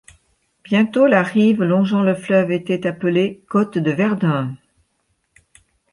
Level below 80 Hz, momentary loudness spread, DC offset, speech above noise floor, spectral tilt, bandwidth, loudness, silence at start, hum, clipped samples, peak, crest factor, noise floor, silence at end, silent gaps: -62 dBFS; 6 LU; under 0.1%; 51 dB; -7.5 dB/octave; 11 kHz; -18 LUFS; 0.7 s; none; under 0.1%; -2 dBFS; 16 dB; -68 dBFS; 1.35 s; none